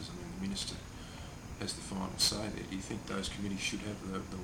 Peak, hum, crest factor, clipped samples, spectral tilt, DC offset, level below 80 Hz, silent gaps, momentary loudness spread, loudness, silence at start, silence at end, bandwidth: -16 dBFS; none; 22 dB; under 0.1%; -3 dB/octave; under 0.1%; -52 dBFS; none; 16 LU; -37 LUFS; 0 s; 0 s; 17 kHz